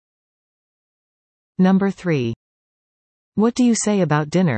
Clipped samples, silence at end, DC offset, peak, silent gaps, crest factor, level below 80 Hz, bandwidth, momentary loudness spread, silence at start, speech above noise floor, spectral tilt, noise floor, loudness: under 0.1%; 0 s; under 0.1%; -6 dBFS; 2.36-3.32 s; 16 dB; -60 dBFS; 8.8 kHz; 12 LU; 1.6 s; over 73 dB; -6 dB/octave; under -90 dBFS; -19 LUFS